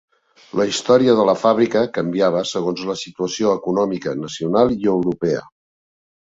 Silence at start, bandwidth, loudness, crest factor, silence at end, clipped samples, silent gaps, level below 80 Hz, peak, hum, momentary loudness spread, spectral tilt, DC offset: 0.55 s; 8 kHz; -19 LUFS; 18 dB; 0.9 s; under 0.1%; none; -56 dBFS; 0 dBFS; none; 10 LU; -5.5 dB/octave; under 0.1%